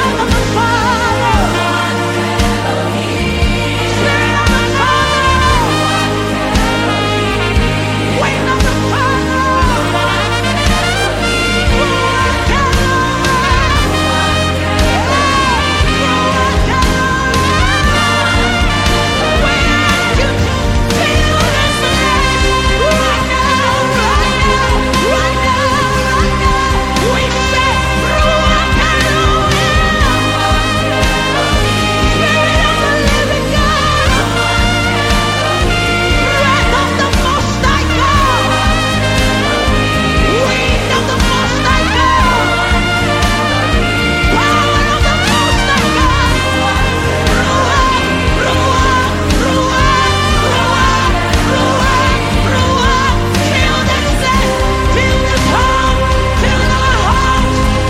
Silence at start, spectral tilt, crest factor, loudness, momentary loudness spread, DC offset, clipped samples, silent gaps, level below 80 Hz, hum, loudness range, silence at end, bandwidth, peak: 0 s; -4.5 dB/octave; 12 dB; -12 LUFS; 3 LU; under 0.1%; under 0.1%; none; -20 dBFS; none; 1 LU; 0 s; 16 kHz; 0 dBFS